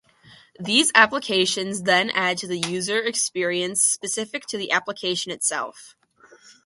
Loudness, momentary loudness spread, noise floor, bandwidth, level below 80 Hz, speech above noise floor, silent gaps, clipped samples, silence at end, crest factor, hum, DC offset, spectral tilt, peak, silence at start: -21 LUFS; 11 LU; -53 dBFS; 12 kHz; -70 dBFS; 30 dB; none; under 0.1%; 0.15 s; 24 dB; none; under 0.1%; -1.5 dB/octave; 0 dBFS; 0.6 s